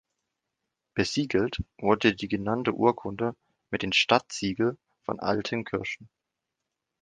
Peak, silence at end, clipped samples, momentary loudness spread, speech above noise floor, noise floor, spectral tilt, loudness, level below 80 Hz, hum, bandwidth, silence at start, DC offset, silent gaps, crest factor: -6 dBFS; 0.95 s; under 0.1%; 11 LU; 58 dB; -85 dBFS; -4.5 dB/octave; -27 LUFS; -54 dBFS; none; 9.8 kHz; 0.95 s; under 0.1%; none; 24 dB